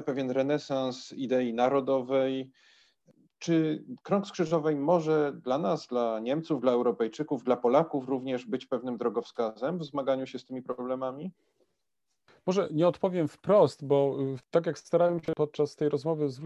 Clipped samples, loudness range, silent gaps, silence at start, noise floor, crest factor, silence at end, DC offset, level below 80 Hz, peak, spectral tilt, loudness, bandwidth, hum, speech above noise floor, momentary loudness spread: under 0.1%; 6 LU; none; 0 s; -84 dBFS; 20 dB; 0 s; under 0.1%; -74 dBFS; -10 dBFS; -7 dB/octave; -29 LUFS; 10 kHz; none; 56 dB; 9 LU